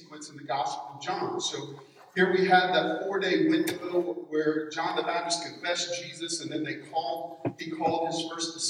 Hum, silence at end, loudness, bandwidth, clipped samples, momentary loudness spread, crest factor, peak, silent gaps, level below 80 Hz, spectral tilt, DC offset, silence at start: none; 0 s; -29 LUFS; 16 kHz; under 0.1%; 11 LU; 20 dB; -10 dBFS; none; -80 dBFS; -3.5 dB/octave; under 0.1%; 0 s